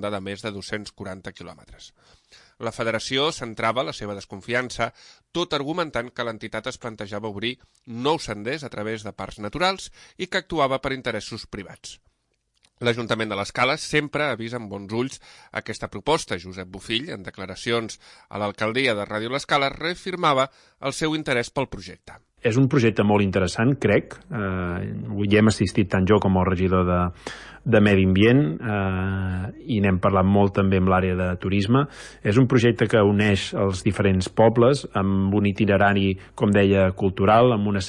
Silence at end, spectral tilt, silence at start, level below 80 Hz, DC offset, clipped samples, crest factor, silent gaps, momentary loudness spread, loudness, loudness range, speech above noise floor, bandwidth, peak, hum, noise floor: 0 s; -6 dB/octave; 0 s; -52 dBFS; under 0.1%; under 0.1%; 18 dB; none; 15 LU; -23 LUFS; 8 LU; 49 dB; 11.5 kHz; -4 dBFS; none; -71 dBFS